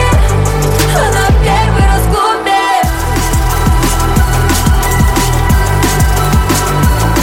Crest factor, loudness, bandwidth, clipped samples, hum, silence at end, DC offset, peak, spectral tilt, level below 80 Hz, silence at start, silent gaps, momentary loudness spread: 10 dB; -11 LUFS; 17 kHz; under 0.1%; none; 0 s; under 0.1%; 0 dBFS; -5 dB/octave; -14 dBFS; 0 s; none; 2 LU